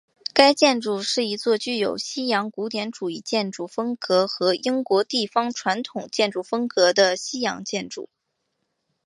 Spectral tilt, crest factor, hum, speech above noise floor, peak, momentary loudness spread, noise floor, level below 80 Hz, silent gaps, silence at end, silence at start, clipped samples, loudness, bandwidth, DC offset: -3 dB/octave; 24 dB; none; 53 dB; 0 dBFS; 11 LU; -76 dBFS; -72 dBFS; none; 1 s; 0.35 s; under 0.1%; -22 LUFS; 11.5 kHz; under 0.1%